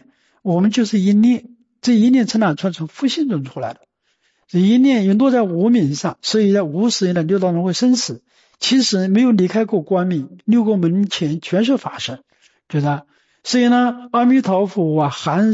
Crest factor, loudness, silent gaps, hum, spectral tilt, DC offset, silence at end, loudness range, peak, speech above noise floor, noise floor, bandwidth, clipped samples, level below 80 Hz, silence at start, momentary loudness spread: 10 dB; -17 LUFS; none; none; -5.5 dB/octave; under 0.1%; 0 s; 3 LU; -6 dBFS; 49 dB; -65 dBFS; 8 kHz; under 0.1%; -64 dBFS; 0.45 s; 10 LU